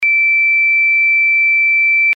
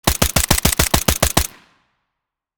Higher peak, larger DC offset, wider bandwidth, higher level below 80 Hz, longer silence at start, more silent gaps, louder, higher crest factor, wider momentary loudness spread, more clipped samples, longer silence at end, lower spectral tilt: second, -8 dBFS vs 0 dBFS; neither; second, 4.9 kHz vs over 20 kHz; second, -82 dBFS vs -28 dBFS; about the same, 0 s vs 0.05 s; neither; first, -9 LUFS vs -16 LUFS; second, 4 dB vs 20 dB; second, 0 LU vs 4 LU; neither; second, 0 s vs 1.1 s; second, 5.5 dB/octave vs -3 dB/octave